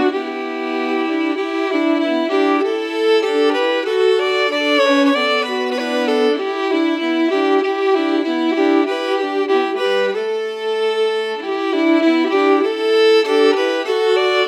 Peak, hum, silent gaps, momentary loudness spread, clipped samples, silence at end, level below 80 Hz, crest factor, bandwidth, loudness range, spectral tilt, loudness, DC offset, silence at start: -2 dBFS; none; none; 6 LU; under 0.1%; 0 s; under -90 dBFS; 14 dB; 12 kHz; 2 LU; -3 dB/octave; -17 LUFS; under 0.1%; 0 s